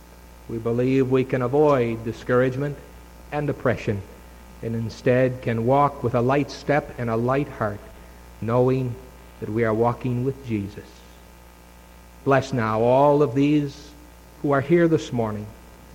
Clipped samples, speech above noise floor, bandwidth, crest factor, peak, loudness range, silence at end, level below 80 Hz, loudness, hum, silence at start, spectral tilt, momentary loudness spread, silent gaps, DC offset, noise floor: under 0.1%; 25 dB; 17 kHz; 18 dB; -6 dBFS; 5 LU; 0 s; -46 dBFS; -22 LUFS; none; 0.1 s; -8 dB/octave; 14 LU; none; under 0.1%; -47 dBFS